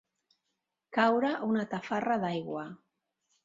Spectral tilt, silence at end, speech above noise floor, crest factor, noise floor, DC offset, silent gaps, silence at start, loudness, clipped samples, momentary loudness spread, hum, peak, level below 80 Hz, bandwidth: -6.5 dB/octave; 0.7 s; 54 dB; 20 dB; -84 dBFS; under 0.1%; none; 0.9 s; -31 LUFS; under 0.1%; 13 LU; none; -12 dBFS; -76 dBFS; 7.6 kHz